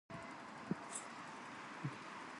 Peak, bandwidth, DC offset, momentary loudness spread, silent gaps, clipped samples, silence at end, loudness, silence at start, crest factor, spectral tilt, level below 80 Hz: -26 dBFS; 11.5 kHz; under 0.1%; 6 LU; none; under 0.1%; 0 s; -48 LUFS; 0.1 s; 22 dB; -4 dB/octave; -80 dBFS